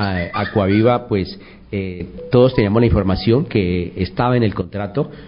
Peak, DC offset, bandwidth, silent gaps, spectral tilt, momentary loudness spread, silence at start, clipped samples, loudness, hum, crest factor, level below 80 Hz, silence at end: -2 dBFS; 0.1%; 5.4 kHz; none; -12.5 dB/octave; 12 LU; 0 s; under 0.1%; -17 LUFS; none; 14 dB; -32 dBFS; 0 s